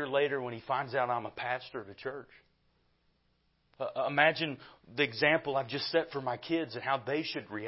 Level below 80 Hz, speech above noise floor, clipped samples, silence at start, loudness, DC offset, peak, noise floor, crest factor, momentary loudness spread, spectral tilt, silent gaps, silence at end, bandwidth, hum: -74 dBFS; 41 dB; under 0.1%; 0 s; -32 LUFS; under 0.1%; -10 dBFS; -74 dBFS; 24 dB; 15 LU; -8 dB/octave; none; 0 s; 5.8 kHz; none